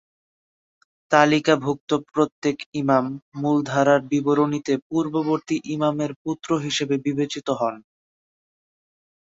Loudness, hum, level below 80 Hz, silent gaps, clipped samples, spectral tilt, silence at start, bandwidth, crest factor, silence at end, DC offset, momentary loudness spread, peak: -22 LUFS; none; -64 dBFS; 1.80-1.87 s, 2.32-2.42 s, 2.66-2.72 s, 3.22-3.32 s, 4.82-4.90 s, 6.16-6.25 s; under 0.1%; -5.5 dB/octave; 1.1 s; 7.8 kHz; 20 dB; 1.6 s; under 0.1%; 8 LU; -2 dBFS